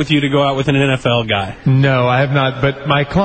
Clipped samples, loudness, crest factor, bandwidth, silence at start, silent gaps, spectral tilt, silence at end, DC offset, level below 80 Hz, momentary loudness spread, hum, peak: under 0.1%; -14 LUFS; 14 dB; 8.8 kHz; 0 s; none; -7 dB/octave; 0 s; under 0.1%; -38 dBFS; 4 LU; none; 0 dBFS